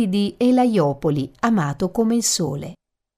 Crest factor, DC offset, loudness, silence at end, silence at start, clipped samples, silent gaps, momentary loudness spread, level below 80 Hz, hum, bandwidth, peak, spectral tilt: 16 dB; under 0.1%; -20 LUFS; 0.45 s; 0 s; under 0.1%; none; 8 LU; -52 dBFS; none; 15.5 kHz; -4 dBFS; -5 dB/octave